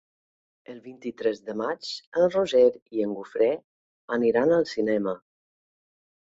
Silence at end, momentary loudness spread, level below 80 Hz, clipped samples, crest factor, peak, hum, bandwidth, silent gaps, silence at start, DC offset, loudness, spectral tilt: 1.15 s; 16 LU; -68 dBFS; under 0.1%; 18 dB; -8 dBFS; none; 7.8 kHz; 2.07-2.12 s, 2.82-2.86 s, 3.64-4.08 s; 0.7 s; under 0.1%; -25 LUFS; -5.5 dB/octave